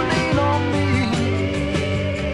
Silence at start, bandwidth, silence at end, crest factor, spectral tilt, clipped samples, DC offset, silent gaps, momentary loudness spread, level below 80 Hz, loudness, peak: 0 s; 11.5 kHz; 0 s; 14 dB; -6 dB/octave; under 0.1%; under 0.1%; none; 3 LU; -38 dBFS; -20 LUFS; -6 dBFS